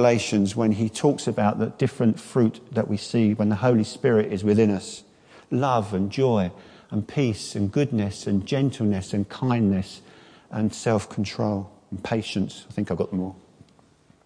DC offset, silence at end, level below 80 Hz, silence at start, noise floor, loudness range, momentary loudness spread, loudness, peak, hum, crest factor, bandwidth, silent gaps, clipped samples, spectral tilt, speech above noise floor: under 0.1%; 0.9 s; -60 dBFS; 0 s; -57 dBFS; 5 LU; 9 LU; -24 LUFS; -6 dBFS; none; 18 dB; 10.5 kHz; none; under 0.1%; -6.5 dB/octave; 34 dB